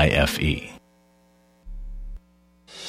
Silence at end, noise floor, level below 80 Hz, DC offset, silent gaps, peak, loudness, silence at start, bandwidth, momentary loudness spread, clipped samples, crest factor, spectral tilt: 0 s; -59 dBFS; -34 dBFS; under 0.1%; none; -4 dBFS; -23 LUFS; 0 s; 16 kHz; 25 LU; under 0.1%; 24 dB; -5 dB/octave